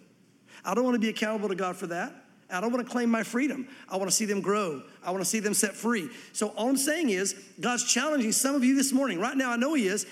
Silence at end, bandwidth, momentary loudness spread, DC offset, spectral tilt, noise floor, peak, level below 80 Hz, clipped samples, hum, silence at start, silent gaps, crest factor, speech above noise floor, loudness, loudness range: 0 s; 16 kHz; 9 LU; under 0.1%; -3 dB/octave; -59 dBFS; -10 dBFS; -82 dBFS; under 0.1%; none; 0.5 s; none; 18 dB; 32 dB; -28 LUFS; 4 LU